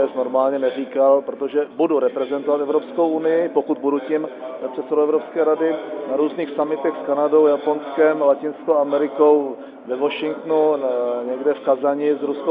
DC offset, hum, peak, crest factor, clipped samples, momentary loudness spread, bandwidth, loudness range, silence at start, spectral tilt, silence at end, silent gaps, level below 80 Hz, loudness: under 0.1%; none; -4 dBFS; 16 dB; under 0.1%; 7 LU; 3.9 kHz; 3 LU; 0 s; -10 dB/octave; 0 s; none; -78 dBFS; -20 LUFS